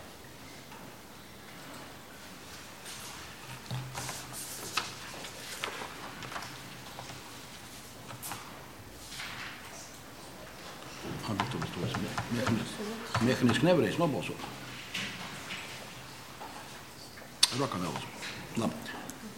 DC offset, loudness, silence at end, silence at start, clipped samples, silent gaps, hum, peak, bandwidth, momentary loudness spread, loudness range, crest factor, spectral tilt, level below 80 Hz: 0.1%; -35 LUFS; 0 s; 0 s; under 0.1%; none; none; -2 dBFS; 17 kHz; 19 LU; 12 LU; 34 dB; -4 dB/octave; -62 dBFS